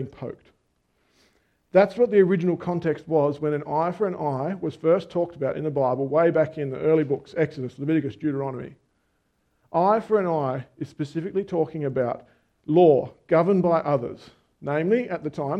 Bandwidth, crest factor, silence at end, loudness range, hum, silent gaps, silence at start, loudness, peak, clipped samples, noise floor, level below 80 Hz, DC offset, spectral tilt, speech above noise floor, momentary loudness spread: 8.6 kHz; 20 dB; 0 s; 4 LU; none; none; 0 s; -24 LUFS; -4 dBFS; under 0.1%; -70 dBFS; -64 dBFS; under 0.1%; -9 dB/octave; 47 dB; 13 LU